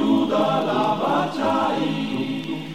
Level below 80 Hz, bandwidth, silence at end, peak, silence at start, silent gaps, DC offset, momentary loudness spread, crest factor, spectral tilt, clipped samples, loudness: -62 dBFS; 15 kHz; 0 s; -8 dBFS; 0 s; none; 0.4%; 6 LU; 12 dB; -6.5 dB/octave; under 0.1%; -22 LUFS